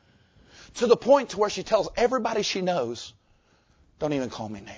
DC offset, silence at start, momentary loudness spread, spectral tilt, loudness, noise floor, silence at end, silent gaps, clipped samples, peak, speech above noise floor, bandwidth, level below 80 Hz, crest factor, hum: under 0.1%; 0.6 s; 15 LU; -4.5 dB/octave; -25 LUFS; -63 dBFS; 0 s; none; under 0.1%; -6 dBFS; 38 dB; 8 kHz; -56 dBFS; 20 dB; none